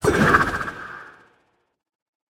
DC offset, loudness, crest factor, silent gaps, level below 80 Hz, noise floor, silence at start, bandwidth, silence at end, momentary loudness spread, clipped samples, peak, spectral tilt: under 0.1%; -19 LUFS; 22 dB; none; -44 dBFS; -66 dBFS; 0 s; 18 kHz; 1.3 s; 21 LU; under 0.1%; -2 dBFS; -5.5 dB/octave